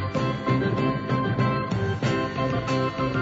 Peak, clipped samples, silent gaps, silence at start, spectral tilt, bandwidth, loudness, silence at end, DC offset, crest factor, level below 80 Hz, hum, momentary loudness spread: -10 dBFS; under 0.1%; none; 0 s; -7 dB/octave; 7.8 kHz; -25 LUFS; 0 s; under 0.1%; 14 dB; -46 dBFS; none; 2 LU